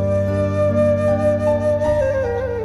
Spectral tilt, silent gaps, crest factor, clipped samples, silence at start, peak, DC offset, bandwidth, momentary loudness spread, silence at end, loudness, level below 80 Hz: -8.5 dB/octave; none; 12 dB; under 0.1%; 0 s; -6 dBFS; under 0.1%; 11 kHz; 3 LU; 0 s; -18 LUFS; -36 dBFS